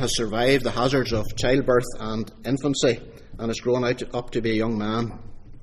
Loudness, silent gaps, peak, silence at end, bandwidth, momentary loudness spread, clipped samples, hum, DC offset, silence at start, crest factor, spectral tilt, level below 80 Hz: -24 LUFS; none; -6 dBFS; 0 s; 14.5 kHz; 10 LU; under 0.1%; none; under 0.1%; 0 s; 18 dB; -5 dB/octave; -38 dBFS